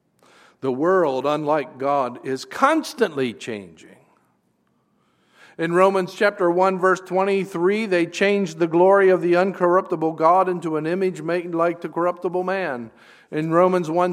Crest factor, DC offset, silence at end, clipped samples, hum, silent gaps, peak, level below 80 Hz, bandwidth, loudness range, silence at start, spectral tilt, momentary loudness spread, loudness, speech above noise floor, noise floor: 20 dB; under 0.1%; 0 s; under 0.1%; none; none; 0 dBFS; -74 dBFS; 14 kHz; 7 LU; 0.65 s; -6 dB/octave; 10 LU; -20 LUFS; 46 dB; -66 dBFS